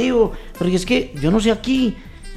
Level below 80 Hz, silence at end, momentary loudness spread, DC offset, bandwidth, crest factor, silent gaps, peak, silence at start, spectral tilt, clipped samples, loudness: -34 dBFS; 0 s; 6 LU; 0.1%; 13.5 kHz; 14 dB; none; -4 dBFS; 0 s; -5.5 dB/octave; under 0.1%; -19 LUFS